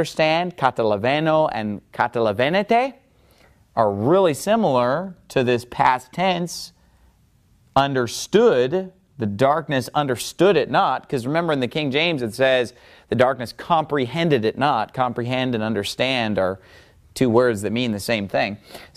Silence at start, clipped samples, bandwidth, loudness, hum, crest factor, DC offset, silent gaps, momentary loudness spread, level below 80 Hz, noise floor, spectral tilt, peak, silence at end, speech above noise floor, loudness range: 0 s; under 0.1%; 15.5 kHz; -21 LUFS; none; 18 dB; under 0.1%; none; 9 LU; -54 dBFS; -58 dBFS; -5.5 dB/octave; -2 dBFS; 0.1 s; 37 dB; 2 LU